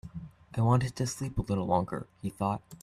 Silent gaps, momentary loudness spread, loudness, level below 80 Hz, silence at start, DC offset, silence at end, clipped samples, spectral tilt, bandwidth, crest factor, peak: none; 13 LU; -31 LUFS; -50 dBFS; 0.05 s; under 0.1%; 0.05 s; under 0.1%; -6.5 dB/octave; 13.5 kHz; 20 dB; -12 dBFS